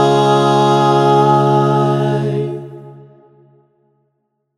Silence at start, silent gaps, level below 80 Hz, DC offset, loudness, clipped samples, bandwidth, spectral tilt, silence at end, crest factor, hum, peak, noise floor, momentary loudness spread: 0 s; none; -62 dBFS; under 0.1%; -13 LUFS; under 0.1%; 11.5 kHz; -7 dB/octave; 1.65 s; 14 dB; none; 0 dBFS; -69 dBFS; 11 LU